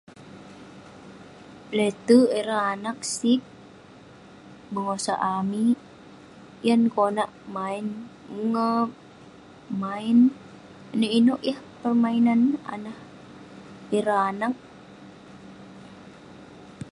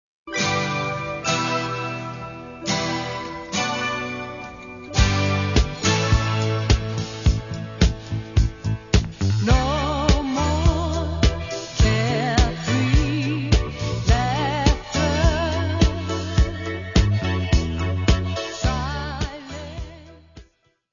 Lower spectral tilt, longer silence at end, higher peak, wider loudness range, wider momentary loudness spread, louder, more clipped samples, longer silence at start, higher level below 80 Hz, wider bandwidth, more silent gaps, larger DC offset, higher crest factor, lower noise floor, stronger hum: about the same, -5 dB/octave vs -5 dB/octave; second, 0 s vs 0.5 s; second, -6 dBFS vs 0 dBFS; first, 7 LU vs 4 LU; first, 26 LU vs 10 LU; about the same, -24 LUFS vs -22 LUFS; neither; about the same, 0.2 s vs 0.25 s; second, -66 dBFS vs -26 dBFS; first, 11.5 kHz vs 7.4 kHz; neither; neither; about the same, 20 dB vs 20 dB; second, -48 dBFS vs -57 dBFS; neither